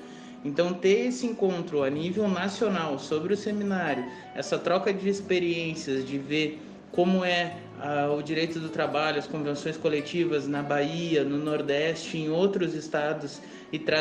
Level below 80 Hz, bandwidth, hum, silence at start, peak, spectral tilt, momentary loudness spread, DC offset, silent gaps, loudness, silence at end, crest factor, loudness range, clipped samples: -68 dBFS; 9.8 kHz; none; 0 s; -10 dBFS; -5.5 dB/octave; 7 LU; under 0.1%; none; -28 LUFS; 0 s; 18 dB; 1 LU; under 0.1%